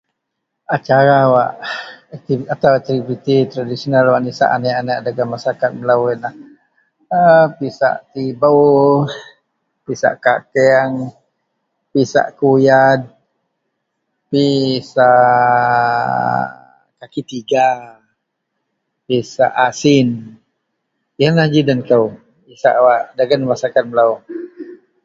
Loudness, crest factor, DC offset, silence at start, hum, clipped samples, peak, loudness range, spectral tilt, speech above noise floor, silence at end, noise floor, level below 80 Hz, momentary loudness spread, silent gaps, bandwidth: -14 LUFS; 16 dB; under 0.1%; 0.7 s; none; under 0.1%; 0 dBFS; 4 LU; -6.5 dB/octave; 62 dB; 0.3 s; -75 dBFS; -58 dBFS; 15 LU; none; 7.8 kHz